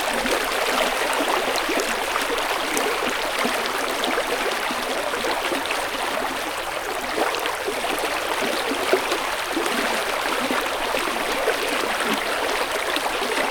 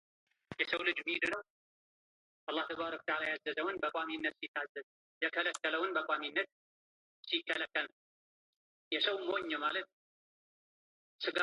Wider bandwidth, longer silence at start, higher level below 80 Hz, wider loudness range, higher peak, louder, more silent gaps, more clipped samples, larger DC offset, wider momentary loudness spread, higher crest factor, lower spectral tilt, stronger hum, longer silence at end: first, over 20 kHz vs 10.5 kHz; second, 0 s vs 0.5 s; first, -48 dBFS vs -80 dBFS; about the same, 2 LU vs 2 LU; first, -4 dBFS vs -16 dBFS; first, -23 LUFS vs -36 LUFS; second, none vs 1.50-2.47 s, 4.48-4.54 s, 4.69-4.75 s, 4.83-5.21 s, 6.52-7.23 s, 7.93-8.91 s, 9.93-11.19 s; neither; neither; second, 3 LU vs 10 LU; about the same, 20 dB vs 22 dB; about the same, -1.5 dB/octave vs -2.5 dB/octave; neither; about the same, 0 s vs 0 s